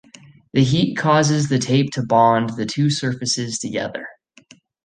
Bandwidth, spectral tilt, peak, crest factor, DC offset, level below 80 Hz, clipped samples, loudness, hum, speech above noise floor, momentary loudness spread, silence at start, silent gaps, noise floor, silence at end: 9.8 kHz; -5 dB/octave; -2 dBFS; 18 dB; under 0.1%; -54 dBFS; under 0.1%; -19 LUFS; none; 32 dB; 9 LU; 0.55 s; none; -51 dBFS; 0.75 s